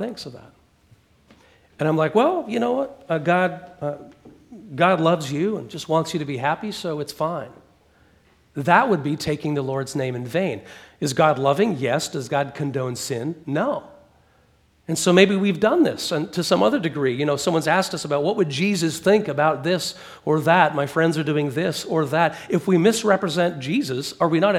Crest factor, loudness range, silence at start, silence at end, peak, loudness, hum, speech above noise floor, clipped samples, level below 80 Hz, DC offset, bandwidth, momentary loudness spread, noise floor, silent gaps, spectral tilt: 22 dB; 4 LU; 0 s; 0 s; 0 dBFS; -21 LUFS; none; 38 dB; under 0.1%; -62 dBFS; under 0.1%; 16.5 kHz; 10 LU; -59 dBFS; none; -5 dB/octave